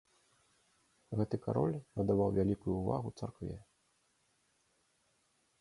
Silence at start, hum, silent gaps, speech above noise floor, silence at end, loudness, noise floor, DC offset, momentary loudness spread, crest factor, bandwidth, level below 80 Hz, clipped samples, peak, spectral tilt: 1.1 s; none; none; 41 dB; 2 s; -36 LUFS; -76 dBFS; under 0.1%; 13 LU; 20 dB; 11.5 kHz; -58 dBFS; under 0.1%; -18 dBFS; -9.5 dB/octave